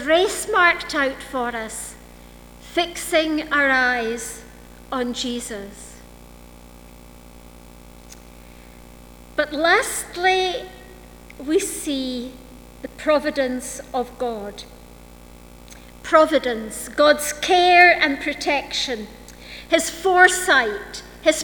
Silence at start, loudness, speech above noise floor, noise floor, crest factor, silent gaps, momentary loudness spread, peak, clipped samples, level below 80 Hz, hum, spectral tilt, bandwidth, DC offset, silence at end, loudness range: 0 s; -19 LUFS; 23 dB; -43 dBFS; 22 dB; none; 21 LU; 0 dBFS; under 0.1%; -46 dBFS; 60 Hz at -50 dBFS; -2 dB/octave; over 20 kHz; under 0.1%; 0 s; 13 LU